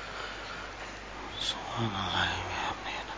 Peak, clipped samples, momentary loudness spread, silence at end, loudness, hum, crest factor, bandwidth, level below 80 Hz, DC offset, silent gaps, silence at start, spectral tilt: -16 dBFS; under 0.1%; 11 LU; 0 s; -34 LUFS; none; 18 dB; 8 kHz; -50 dBFS; under 0.1%; none; 0 s; -3.5 dB/octave